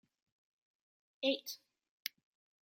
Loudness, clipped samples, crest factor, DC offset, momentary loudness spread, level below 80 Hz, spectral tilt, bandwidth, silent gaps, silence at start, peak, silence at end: -40 LUFS; under 0.1%; 28 dB; under 0.1%; 12 LU; under -90 dBFS; -1 dB/octave; 16.5 kHz; 1.89-2.00 s; 1.2 s; -16 dBFS; 0.55 s